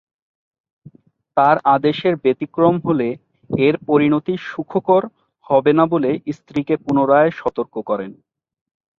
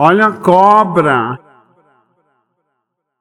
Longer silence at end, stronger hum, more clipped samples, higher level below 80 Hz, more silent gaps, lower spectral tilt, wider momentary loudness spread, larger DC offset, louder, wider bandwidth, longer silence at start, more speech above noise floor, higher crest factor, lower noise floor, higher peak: second, 0.85 s vs 1.85 s; neither; second, under 0.1% vs 0.3%; about the same, -60 dBFS vs -58 dBFS; neither; first, -8.5 dB/octave vs -7 dB/octave; about the same, 10 LU vs 12 LU; neither; second, -18 LUFS vs -10 LUFS; second, 6.8 kHz vs 16 kHz; first, 1.35 s vs 0 s; second, 33 dB vs 62 dB; about the same, 18 dB vs 14 dB; second, -50 dBFS vs -71 dBFS; about the same, -2 dBFS vs 0 dBFS